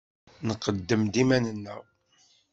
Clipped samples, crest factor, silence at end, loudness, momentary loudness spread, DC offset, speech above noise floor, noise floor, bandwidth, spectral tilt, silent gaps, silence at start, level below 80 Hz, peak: under 0.1%; 20 dB; 0.7 s; -27 LUFS; 16 LU; under 0.1%; 38 dB; -64 dBFS; 8 kHz; -5.5 dB/octave; none; 0.4 s; -58 dBFS; -8 dBFS